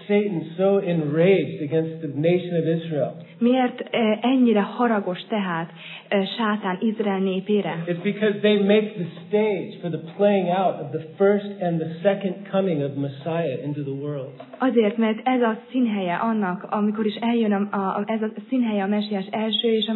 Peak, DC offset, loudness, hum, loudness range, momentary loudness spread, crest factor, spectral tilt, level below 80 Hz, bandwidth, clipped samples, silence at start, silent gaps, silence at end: -6 dBFS; under 0.1%; -23 LUFS; none; 2 LU; 9 LU; 16 dB; -10.5 dB/octave; -82 dBFS; 4.3 kHz; under 0.1%; 0 s; none; 0 s